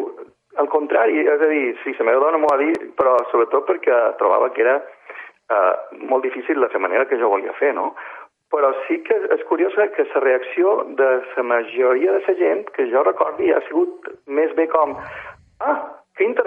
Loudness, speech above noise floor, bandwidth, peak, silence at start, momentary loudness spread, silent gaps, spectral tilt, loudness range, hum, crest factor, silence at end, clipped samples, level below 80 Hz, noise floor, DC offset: -19 LUFS; 21 dB; 4.7 kHz; -2 dBFS; 0 s; 9 LU; none; -6 dB/octave; 3 LU; none; 16 dB; 0 s; under 0.1%; -66 dBFS; -39 dBFS; under 0.1%